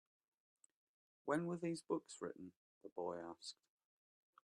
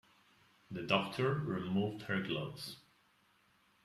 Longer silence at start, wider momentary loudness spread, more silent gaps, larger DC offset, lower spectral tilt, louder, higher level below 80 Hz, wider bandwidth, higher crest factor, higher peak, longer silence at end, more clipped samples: first, 1.25 s vs 0.7 s; first, 17 LU vs 13 LU; first, 2.56-2.81 s, 2.92-2.96 s vs none; neither; about the same, -5.5 dB/octave vs -6 dB/octave; second, -46 LUFS vs -37 LUFS; second, -88 dBFS vs -72 dBFS; second, 11.5 kHz vs 14 kHz; about the same, 24 dB vs 22 dB; second, -26 dBFS vs -16 dBFS; about the same, 0.95 s vs 1.05 s; neither